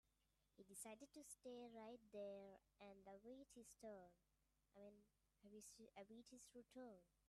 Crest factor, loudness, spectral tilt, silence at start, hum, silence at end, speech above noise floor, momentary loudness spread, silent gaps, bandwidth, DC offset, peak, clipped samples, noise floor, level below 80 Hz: 18 dB; -62 LUFS; -3.5 dB/octave; 0.55 s; none; 0 s; 25 dB; 9 LU; none; 13 kHz; under 0.1%; -44 dBFS; under 0.1%; -87 dBFS; -88 dBFS